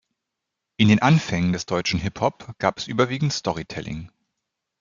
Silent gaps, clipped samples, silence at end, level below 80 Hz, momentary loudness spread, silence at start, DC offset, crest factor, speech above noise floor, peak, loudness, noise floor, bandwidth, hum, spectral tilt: none; under 0.1%; 0.75 s; -52 dBFS; 14 LU; 0.8 s; under 0.1%; 20 dB; 60 dB; -2 dBFS; -22 LUFS; -83 dBFS; 7.6 kHz; none; -5.5 dB/octave